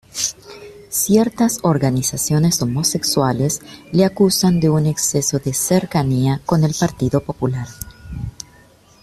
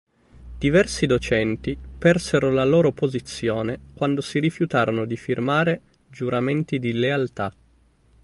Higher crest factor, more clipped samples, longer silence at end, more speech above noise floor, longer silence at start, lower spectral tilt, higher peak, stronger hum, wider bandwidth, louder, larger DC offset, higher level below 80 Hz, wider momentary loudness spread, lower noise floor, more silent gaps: about the same, 16 dB vs 18 dB; neither; about the same, 0.7 s vs 0.75 s; second, 32 dB vs 37 dB; second, 0.15 s vs 0.4 s; about the same, -5 dB/octave vs -6 dB/octave; about the same, -2 dBFS vs -4 dBFS; neither; first, 15.5 kHz vs 11.5 kHz; first, -17 LUFS vs -22 LUFS; neither; about the same, -44 dBFS vs -44 dBFS; first, 16 LU vs 9 LU; second, -49 dBFS vs -58 dBFS; neither